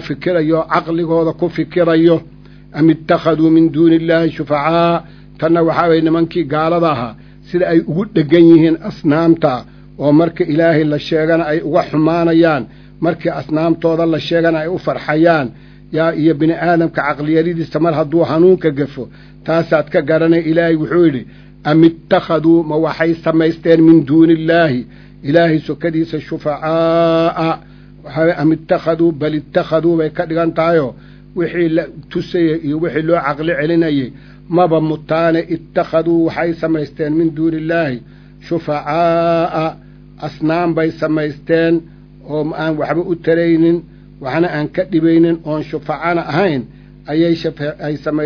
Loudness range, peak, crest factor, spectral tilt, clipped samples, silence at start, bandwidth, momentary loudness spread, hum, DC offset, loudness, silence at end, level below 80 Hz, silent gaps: 4 LU; 0 dBFS; 14 dB; -9 dB/octave; under 0.1%; 0 s; 5.4 kHz; 10 LU; 50 Hz at -40 dBFS; under 0.1%; -14 LUFS; 0 s; -44 dBFS; none